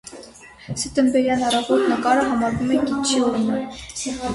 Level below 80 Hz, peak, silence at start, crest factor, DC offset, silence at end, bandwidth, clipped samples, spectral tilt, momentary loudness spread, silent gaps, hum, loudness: -48 dBFS; -4 dBFS; 0.05 s; 16 dB; under 0.1%; 0 s; 11.5 kHz; under 0.1%; -4 dB/octave; 11 LU; none; none; -20 LUFS